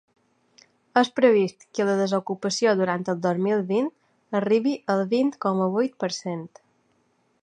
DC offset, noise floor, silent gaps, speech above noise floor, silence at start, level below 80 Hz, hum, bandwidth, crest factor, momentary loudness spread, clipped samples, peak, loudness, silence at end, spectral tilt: under 0.1%; -67 dBFS; none; 44 dB; 0.95 s; -76 dBFS; none; 9.6 kHz; 20 dB; 10 LU; under 0.1%; -4 dBFS; -24 LUFS; 0.95 s; -5.5 dB/octave